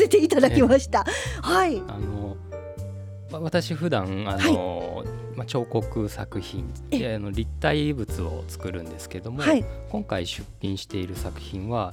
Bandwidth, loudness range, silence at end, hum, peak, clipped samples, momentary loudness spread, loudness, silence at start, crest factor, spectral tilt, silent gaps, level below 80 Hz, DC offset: 18 kHz; 5 LU; 0 s; none; -2 dBFS; under 0.1%; 16 LU; -25 LUFS; 0 s; 24 dB; -5.5 dB/octave; none; -40 dBFS; under 0.1%